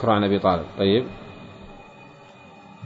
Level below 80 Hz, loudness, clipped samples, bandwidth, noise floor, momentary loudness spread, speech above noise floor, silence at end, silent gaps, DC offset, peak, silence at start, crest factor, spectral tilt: -52 dBFS; -21 LUFS; under 0.1%; 7.6 kHz; -46 dBFS; 24 LU; 26 dB; 0 s; none; under 0.1%; -4 dBFS; 0 s; 20 dB; -8 dB/octave